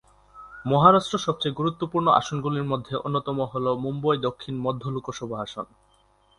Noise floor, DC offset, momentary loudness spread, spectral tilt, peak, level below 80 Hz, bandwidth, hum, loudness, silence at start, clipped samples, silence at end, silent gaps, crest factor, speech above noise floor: -61 dBFS; under 0.1%; 15 LU; -6.5 dB/octave; -2 dBFS; -58 dBFS; 11 kHz; 50 Hz at -55 dBFS; -24 LUFS; 0.35 s; under 0.1%; 0.75 s; none; 24 dB; 37 dB